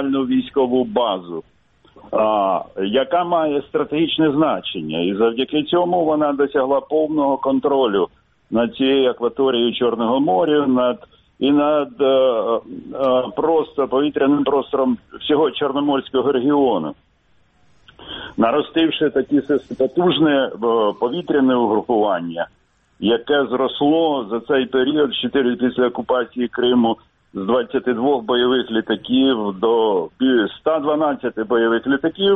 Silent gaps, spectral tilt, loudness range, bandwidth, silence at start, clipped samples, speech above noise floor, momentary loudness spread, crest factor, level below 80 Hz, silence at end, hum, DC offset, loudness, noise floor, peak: none; -8.5 dB/octave; 2 LU; 4 kHz; 0 s; under 0.1%; 40 dB; 6 LU; 16 dB; -56 dBFS; 0 s; none; under 0.1%; -18 LUFS; -58 dBFS; -2 dBFS